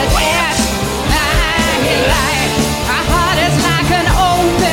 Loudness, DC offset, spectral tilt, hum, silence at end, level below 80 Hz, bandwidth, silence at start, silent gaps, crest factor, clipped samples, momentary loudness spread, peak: -13 LUFS; under 0.1%; -4 dB/octave; none; 0 s; -22 dBFS; 17 kHz; 0 s; none; 12 dB; under 0.1%; 3 LU; -2 dBFS